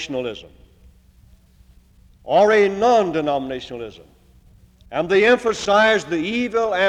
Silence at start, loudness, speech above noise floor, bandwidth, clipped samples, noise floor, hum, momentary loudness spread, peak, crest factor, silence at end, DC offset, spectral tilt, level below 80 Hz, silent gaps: 0 s; -18 LUFS; 33 dB; 10.5 kHz; under 0.1%; -51 dBFS; none; 15 LU; -4 dBFS; 16 dB; 0 s; under 0.1%; -4.5 dB/octave; -52 dBFS; none